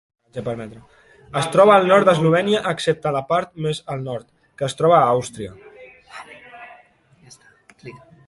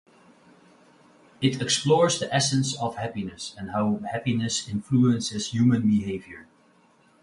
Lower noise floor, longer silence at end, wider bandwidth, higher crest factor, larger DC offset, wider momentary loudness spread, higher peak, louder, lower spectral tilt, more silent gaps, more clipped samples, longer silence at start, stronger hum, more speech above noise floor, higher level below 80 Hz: second, -53 dBFS vs -60 dBFS; second, 0.3 s vs 0.8 s; about the same, 11.5 kHz vs 11.5 kHz; about the same, 18 dB vs 20 dB; neither; first, 25 LU vs 13 LU; first, -2 dBFS vs -6 dBFS; first, -18 LUFS vs -25 LUFS; about the same, -5.5 dB/octave vs -5 dB/octave; neither; neither; second, 0.35 s vs 1.4 s; neither; about the same, 35 dB vs 36 dB; about the same, -58 dBFS vs -58 dBFS